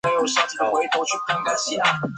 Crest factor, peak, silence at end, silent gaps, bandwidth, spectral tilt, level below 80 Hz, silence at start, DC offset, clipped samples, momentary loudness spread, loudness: 16 dB; -6 dBFS; 0 s; none; 10 kHz; -2.5 dB/octave; -62 dBFS; 0.05 s; under 0.1%; under 0.1%; 3 LU; -21 LUFS